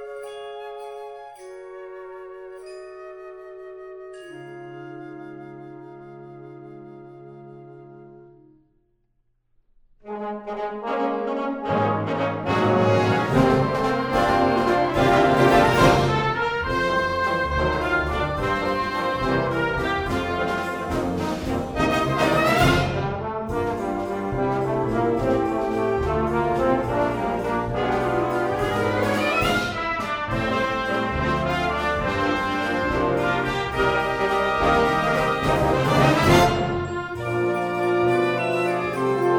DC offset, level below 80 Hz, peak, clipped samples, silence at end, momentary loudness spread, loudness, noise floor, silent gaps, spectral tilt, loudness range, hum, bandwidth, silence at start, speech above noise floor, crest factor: under 0.1%; -40 dBFS; -4 dBFS; under 0.1%; 0 s; 21 LU; -22 LUFS; -67 dBFS; none; -6 dB/octave; 20 LU; none; 16.5 kHz; 0 s; 42 dB; 20 dB